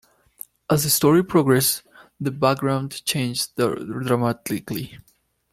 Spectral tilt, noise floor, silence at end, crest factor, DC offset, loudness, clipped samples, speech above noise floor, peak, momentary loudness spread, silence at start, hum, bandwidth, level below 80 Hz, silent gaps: -4.5 dB/octave; -45 dBFS; 0.55 s; 18 dB; under 0.1%; -21 LUFS; under 0.1%; 24 dB; -4 dBFS; 14 LU; 0.7 s; none; 16.5 kHz; -56 dBFS; none